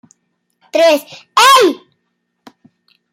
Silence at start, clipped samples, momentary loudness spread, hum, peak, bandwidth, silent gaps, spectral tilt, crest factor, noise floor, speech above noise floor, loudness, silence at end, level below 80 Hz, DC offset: 0.75 s; under 0.1%; 12 LU; none; 0 dBFS; 16 kHz; none; -0.5 dB/octave; 14 dB; -69 dBFS; 58 dB; -11 LUFS; 1.35 s; -70 dBFS; under 0.1%